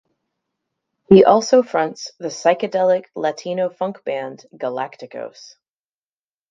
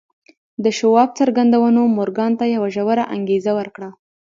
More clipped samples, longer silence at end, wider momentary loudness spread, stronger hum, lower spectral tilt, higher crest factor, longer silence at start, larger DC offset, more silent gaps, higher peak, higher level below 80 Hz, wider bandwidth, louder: neither; first, 1.2 s vs 0.4 s; first, 19 LU vs 12 LU; neither; about the same, -5.5 dB/octave vs -6 dB/octave; about the same, 20 dB vs 16 dB; first, 1.1 s vs 0.6 s; neither; neither; about the same, 0 dBFS vs -2 dBFS; first, -60 dBFS vs -66 dBFS; about the same, 7.6 kHz vs 7.6 kHz; about the same, -18 LUFS vs -17 LUFS